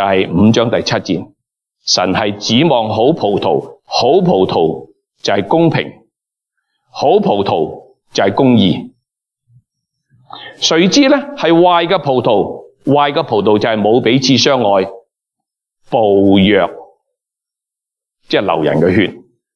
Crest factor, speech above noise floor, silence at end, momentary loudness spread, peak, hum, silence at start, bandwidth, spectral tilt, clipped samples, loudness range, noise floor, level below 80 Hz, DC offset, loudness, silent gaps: 14 dB; 72 dB; 0.35 s; 11 LU; 0 dBFS; none; 0 s; 11 kHz; -5 dB/octave; under 0.1%; 4 LU; -84 dBFS; -52 dBFS; under 0.1%; -13 LUFS; none